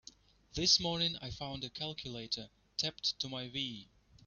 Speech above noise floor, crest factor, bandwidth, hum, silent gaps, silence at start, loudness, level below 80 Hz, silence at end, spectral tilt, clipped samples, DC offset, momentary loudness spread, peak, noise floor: 23 dB; 22 dB; 7.2 kHz; none; none; 0.55 s; -35 LUFS; -62 dBFS; 0.4 s; -2.5 dB/octave; under 0.1%; under 0.1%; 14 LU; -16 dBFS; -60 dBFS